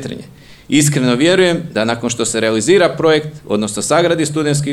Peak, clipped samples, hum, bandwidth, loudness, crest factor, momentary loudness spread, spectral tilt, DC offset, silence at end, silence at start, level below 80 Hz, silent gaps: 0 dBFS; under 0.1%; none; 16 kHz; -14 LUFS; 14 dB; 7 LU; -4.5 dB/octave; 0.2%; 0 s; 0 s; -50 dBFS; none